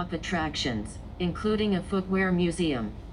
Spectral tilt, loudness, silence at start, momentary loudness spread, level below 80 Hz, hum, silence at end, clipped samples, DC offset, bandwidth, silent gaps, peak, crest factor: -5.5 dB/octave; -28 LUFS; 0 s; 7 LU; -44 dBFS; none; 0 s; under 0.1%; under 0.1%; 10.5 kHz; none; -14 dBFS; 14 dB